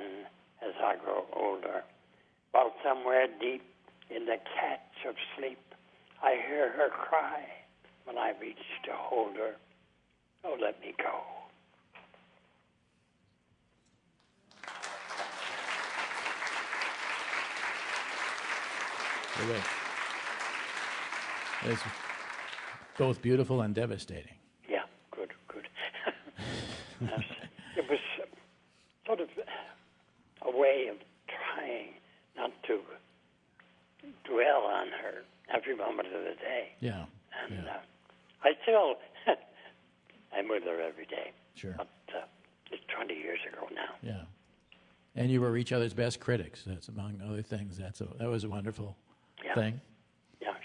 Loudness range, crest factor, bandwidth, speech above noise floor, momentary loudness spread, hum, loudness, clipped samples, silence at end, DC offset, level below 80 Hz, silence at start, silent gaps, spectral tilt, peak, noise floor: 8 LU; 26 dB; 11 kHz; 38 dB; 16 LU; none; -35 LUFS; under 0.1%; 0 s; under 0.1%; -72 dBFS; 0 s; none; -5 dB/octave; -10 dBFS; -72 dBFS